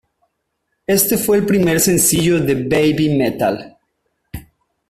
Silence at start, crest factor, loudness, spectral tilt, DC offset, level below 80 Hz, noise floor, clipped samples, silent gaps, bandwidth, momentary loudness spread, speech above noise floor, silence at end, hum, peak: 0.9 s; 16 dB; -15 LUFS; -4.5 dB/octave; under 0.1%; -46 dBFS; -72 dBFS; under 0.1%; none; 16 kHz; 21 LU; 57 dB; 0.5 s; none; -2 dBFS